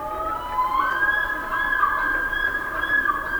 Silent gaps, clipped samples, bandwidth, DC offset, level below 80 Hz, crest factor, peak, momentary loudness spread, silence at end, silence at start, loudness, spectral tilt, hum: none; under 0.1%; over 20 kHz; 0.1%; -42 dBFS; 14 dB; -8 dBFS; 5 LU; 0 s; 0 s; -22 LUFS; -3.5 dB/octave; none